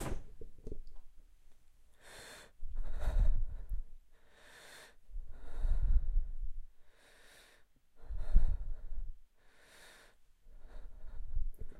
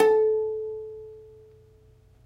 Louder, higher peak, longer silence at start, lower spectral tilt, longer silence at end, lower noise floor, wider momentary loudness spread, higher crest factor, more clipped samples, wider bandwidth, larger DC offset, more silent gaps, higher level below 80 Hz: second, -43 LUFS vs -26 LUFS; second, -14 dBFS vs -6 dBFS; about the same, 0 s vs 0 s; about the same, -6 dB/octave vs -5 dB/octave; second, 0 s vs 1 s; first, -64 dBFS vs -56 dBFS; about the same, 25 LU vs 24 LU; about the same, 22 dB vs 20 dB; neither; first, 9.2 kHz vs 6.2 kHz; neither; neither; first, -36 dBFS vs -62 dBFS